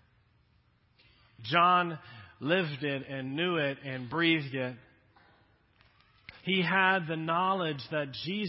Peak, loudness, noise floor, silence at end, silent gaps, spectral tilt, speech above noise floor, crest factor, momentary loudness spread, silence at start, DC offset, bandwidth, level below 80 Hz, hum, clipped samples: -8 dBFS; -30 LUFS; -68 dBFS; 0 s; none; -9 dB/octave; 38 dB; 24 dB; 14 LU; 1.4 s; under 0.1%; 5.8 kHz; -70 dBFS; none; under 0.1%